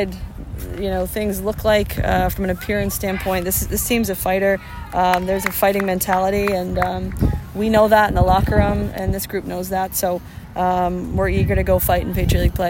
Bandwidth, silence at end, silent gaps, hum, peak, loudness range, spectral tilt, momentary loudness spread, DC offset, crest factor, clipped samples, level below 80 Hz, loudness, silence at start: 16.5 kHz; 0 s; none; none; 0 dBFS; 3 LU; -5.5 dB/octave; 8 LU; under 0.1%; 18 dB; under 0.1%; -28 dBFS; -19 LUFS; 0 s